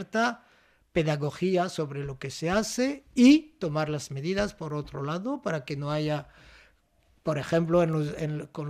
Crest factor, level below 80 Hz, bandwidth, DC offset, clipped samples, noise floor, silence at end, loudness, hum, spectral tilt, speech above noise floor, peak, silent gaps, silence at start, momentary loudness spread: 20 dB; -54 dBFS; 14.5 kHz; under 0.1%; under 0.1%; -65 dBFS; 0 s; -28 LUFS; none; -6 dB/octave; 38 dB; -8 dBFS; none; 0 s; 11 LU